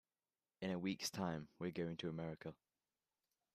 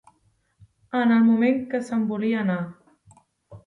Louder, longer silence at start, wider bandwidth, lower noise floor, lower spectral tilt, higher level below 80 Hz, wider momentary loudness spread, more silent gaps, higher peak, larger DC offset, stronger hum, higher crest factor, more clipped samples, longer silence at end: second, -46 LUFS vs -22 LUFS; second, 0.6 s vs 0.95 s; first, 14.5 kHz vs 7.4 kHz; first, under -90 dBFS vs -66 dBFS; second, -5 dB/octave vs -7.5 dB/octave; second, -78 dBFS vs -66 dBFS; second, 7 LU vs 11 LU; neither; second, -30 dBFS vs -10 dBFS; neither; neither; about the same, 18 dB vs 14 dB; neither; first, 1 s vs 0.1 s